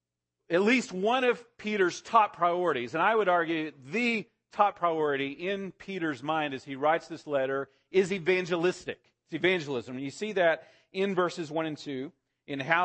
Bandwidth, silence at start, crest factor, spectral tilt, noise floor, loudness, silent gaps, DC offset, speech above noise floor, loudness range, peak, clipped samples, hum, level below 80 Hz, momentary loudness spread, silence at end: 8.8 kHz; 0.5 s; 22 dB; -5 dB/octave; -74 dBFS; -29 LUFS; none; under 0.1%; 46 dB; 4 LU; -8 dBFS; under 0.1%; none; -74 dBFS; 12 LU; 0 s